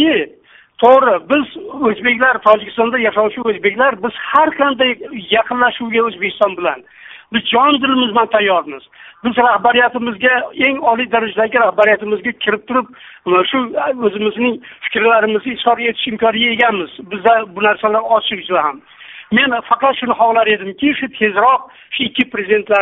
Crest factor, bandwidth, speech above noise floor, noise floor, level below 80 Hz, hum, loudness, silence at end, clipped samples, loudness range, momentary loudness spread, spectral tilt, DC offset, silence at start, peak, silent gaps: 14 dB; 4 kHz; 31 dB; -46 dBFS; -56 dBFS; none; -14 LUFS; 0 s; under 0.1%; 2 LU; 8 LU; -1 dB/octave; under 0.1%; 0 s; 0 dBFS; none